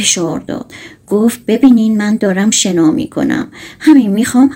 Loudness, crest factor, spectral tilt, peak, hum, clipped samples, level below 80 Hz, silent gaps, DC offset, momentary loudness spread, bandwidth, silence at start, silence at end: -11 LUFS; 12 dB; -4 dB/octave; 0 dBFS; none; 0.4%; -50 dBFS; none; under 0.1%; 13 LU; 16.5 kHz; 0 s; 0 s